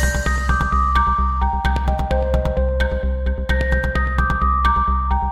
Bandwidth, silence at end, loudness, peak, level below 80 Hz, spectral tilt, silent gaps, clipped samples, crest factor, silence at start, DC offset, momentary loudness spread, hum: 12 kHz; 0 s; -19 LUFS; -4 dBFS; -20 dBFS; -6 dB/octave; none; under 0.1%; 14 dB; 0 s; under 0.1%; 4 LU; none